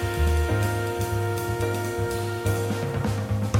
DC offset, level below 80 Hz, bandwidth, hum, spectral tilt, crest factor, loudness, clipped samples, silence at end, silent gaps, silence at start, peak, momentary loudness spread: under 0.1%; -32 dBFS; 16.5 kHz; none; -6 dB/octave; 16 dB; -26 LUFS; under 0.1%; 0 s; none; 0 s; -10 dBFS; 4 LU